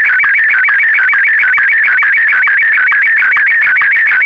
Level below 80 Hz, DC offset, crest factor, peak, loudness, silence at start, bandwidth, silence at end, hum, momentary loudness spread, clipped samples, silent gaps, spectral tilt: -58 dBFS; 0.2%; 4 dB; -4 dBFS; -7 LUFS; 0 s; 7.2 kHz; 0 s; none; 0 LU; under 0.1%; none; -1.5 dB/octave